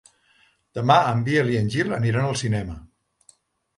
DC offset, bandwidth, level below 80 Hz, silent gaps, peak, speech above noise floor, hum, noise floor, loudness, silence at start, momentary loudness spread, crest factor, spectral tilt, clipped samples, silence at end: under 0.1%; 11.5 kHz; -48 dBFS; none; -2 dBFS; 40 dB; none; -61 dBFS; -22 LUFS; 0.75 s; 15 LU; 22 dB; -6 dB/octave; under 0.1%; 0.9 s